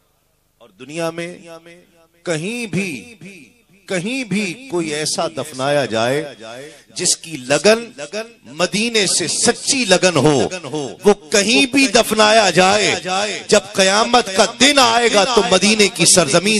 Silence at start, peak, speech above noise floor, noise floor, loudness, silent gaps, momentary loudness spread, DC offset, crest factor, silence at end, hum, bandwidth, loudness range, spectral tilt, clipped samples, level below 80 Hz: 0.8 s; 0 dBFS; 45 dB; -61 dBFS; -15 LUFS; none; 16 LU; under 0.1%; 16 dB; 0 s; none; 15 kHz; 12 LU; -2.5 dB/octave; under 0.1%; -50 dBFS